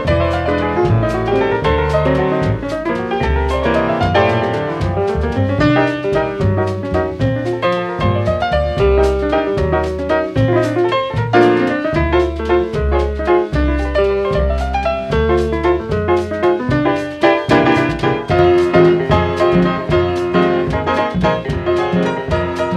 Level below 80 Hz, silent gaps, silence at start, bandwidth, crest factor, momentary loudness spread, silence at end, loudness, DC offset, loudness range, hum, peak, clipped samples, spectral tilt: -26 dBFS; none; 0 s; 10 kHz; 14 dB; 5 LU; 0 s; -15 LUFS; under 0.1%; 3 LU; none; -2 dBFS; under 0.1%; -7.5 dB/octave